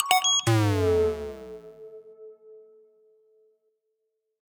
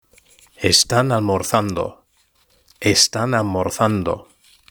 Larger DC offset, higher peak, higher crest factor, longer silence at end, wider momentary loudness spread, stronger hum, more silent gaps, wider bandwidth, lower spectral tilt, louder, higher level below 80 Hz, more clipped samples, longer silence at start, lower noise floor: neither; second, -4 dBFS vs 0 dBFS; first, 26 dB vs 20 dB; first, 1.95 s vs 0.5 s; first, 26 LU vs 11 LU; neither; neither; about the same, over 20 kHz vs over 20 kHz; about the same, -3.5 dB/octave vs -3.5 dB/octave; second, -23 LUFS vs -18 LUFS; about the same, -52 dBFS vs -48 dBFS; neither; second, 0 s vs 0.6 s; first, -79 dBFS vs -61 dBFS